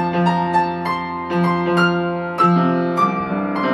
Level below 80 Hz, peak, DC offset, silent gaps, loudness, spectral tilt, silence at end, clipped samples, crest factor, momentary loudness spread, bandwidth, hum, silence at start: -50 dBFS; -4 dBFS; under 0.1%; none; -18 LUFS; -7.5 dB/octave; 0 s; under 0.1%; 14 dB; 7 LU; 11.5 kHz; none; 0 s